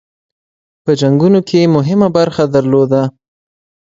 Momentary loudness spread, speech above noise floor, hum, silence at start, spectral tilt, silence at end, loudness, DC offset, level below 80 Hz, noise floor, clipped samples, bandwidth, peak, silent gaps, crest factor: 6 LU; over 79 dB; none; 0.85 s; -7.5 dB/octave; 0.9 s; -12 LUFS; under 0.1%; -52 dBFS; under -90 dBFS; under 0.1%; 7.8 kHz; 0 dBFS; none; 12 dB